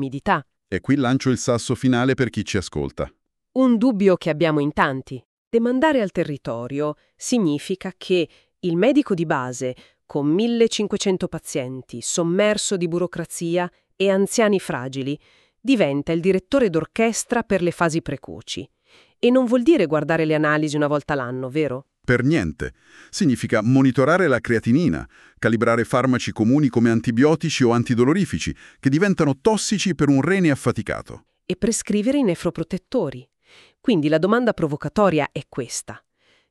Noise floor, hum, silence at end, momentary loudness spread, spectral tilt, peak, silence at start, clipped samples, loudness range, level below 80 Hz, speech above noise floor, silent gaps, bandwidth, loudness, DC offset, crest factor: -53 dBFS; none; 0.55 s; 12 LU; -5.5 dB/octave; -4 dBFS; 0 s; under 0.1%; 3 LU; -50 dBFS; 33 dB; 5.25-5.51 s; 13 kHz; -21 LUFS; under 0.1%; 18 dB